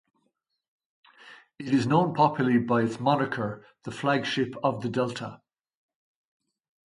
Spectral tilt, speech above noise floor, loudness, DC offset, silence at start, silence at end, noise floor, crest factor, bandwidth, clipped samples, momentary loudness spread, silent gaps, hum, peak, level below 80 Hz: -6.5 dB/octave; 51 dB; -26 LUFS; under 0.1%; 1.25 s; 1.5 s; -77 dBFS; 22 dB; 11 kHz; under 0.1%; 15 LU; none; none; -6 dBFS; -68 dBFS